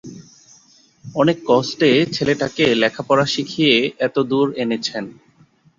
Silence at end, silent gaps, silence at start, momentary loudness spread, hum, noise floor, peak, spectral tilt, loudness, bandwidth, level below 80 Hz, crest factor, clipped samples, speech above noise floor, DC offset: 0.7 s; none; 0.05 s; 9 LU; none; -54 dBFS; -2 dBFS; -5 dB/octave; -18 LUFS; 7.8 kHz; -58 dBFS; 18 dB; under 0.1%; 36 dB; under 0.1%